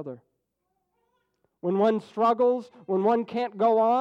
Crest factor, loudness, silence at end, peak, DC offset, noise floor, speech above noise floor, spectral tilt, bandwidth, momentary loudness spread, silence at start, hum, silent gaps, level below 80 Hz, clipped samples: 14 dB; -25 LUFS; 0 s; -12 dBFS; under 0.1%; -78 dBFS; 54 dB; -8 dB/octave; 8 kHz; 9 LU; 0 s; none; none; -80 dBFS; under 0.1%